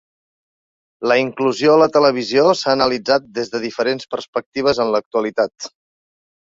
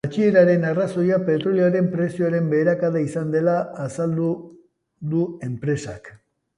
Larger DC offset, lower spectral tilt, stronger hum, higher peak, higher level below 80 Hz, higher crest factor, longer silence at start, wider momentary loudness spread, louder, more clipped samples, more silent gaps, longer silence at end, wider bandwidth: neither; second, -4.5 dB/octave vs -8 dB/octave; neither; first, 0 dBFS vs -4 dBFS; about the same, -58 dBFS vs -60 dBFS; about the same, 18 dB vs 16 dB; first, 1 s vs 0.05 s; about the same, 11 LU vs 10 LU; first, -17 LUFS vs -21 LUFS; neither; first, 4.28-4.33 s, 4.46-4.52 s, 5.06-5.11 s vs none; first, 0.9 s vs 0.4 s; second, 7.8 kHz vs 11 kHz